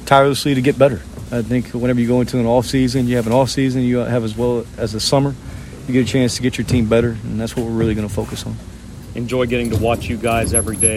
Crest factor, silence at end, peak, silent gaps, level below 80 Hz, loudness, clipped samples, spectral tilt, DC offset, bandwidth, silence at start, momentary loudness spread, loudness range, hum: 16 dB; 0 s; 0 dBFS; none; -36 dBFS; -17 LUFS; under 0.1%; -5 dB/octave; under 0.1%; 16 kHz; 0 s; 11 LU; 3 LU; none